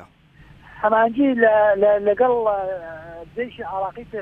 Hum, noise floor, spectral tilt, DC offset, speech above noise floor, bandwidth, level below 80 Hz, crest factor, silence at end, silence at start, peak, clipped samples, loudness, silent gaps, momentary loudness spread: none; -49 dBFS; -8 dB/octave; under 0.1%; 30 dB; 3.8 kHz; -54 dBFS; 16 dB; 0 s; 0 s; -4 dBFS; under 0.1%; -19 LUFS; none; 16 LU